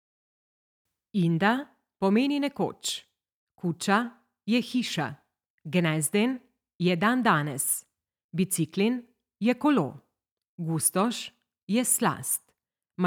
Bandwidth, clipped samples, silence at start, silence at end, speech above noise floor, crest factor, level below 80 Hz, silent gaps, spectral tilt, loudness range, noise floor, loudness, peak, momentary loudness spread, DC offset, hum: 19 kHz; under 0.1%; 1.15 s; 0 s; 49 dB; 20 dB; -74 dBFS; 3.32-3.47 s, 5.50-5.58 s, 6.75-6.79 s, 8.24-8.29 s, 10.32-10.37 s, 10.48-10.58 s, 11.63-11.67 s; -4.5 dB/octave; 2 LU; -75 dBFS; -27 LUFS; -8 dBFS; 12 LU; under 0.1%; none